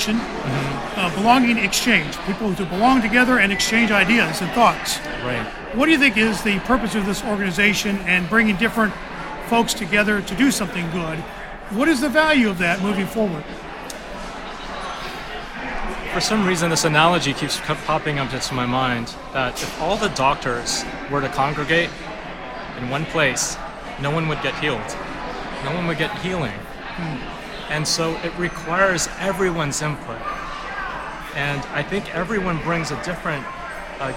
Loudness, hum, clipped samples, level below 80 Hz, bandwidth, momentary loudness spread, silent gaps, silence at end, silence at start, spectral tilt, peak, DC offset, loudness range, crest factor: -20 LUFS; none; under 0.1%; -40 dBFS; 17 kHz; 15 LU; none; 0 s; 0 s; -4 dB/octave; 0 dBFS; under 0.1%; 7 LU; 20 dB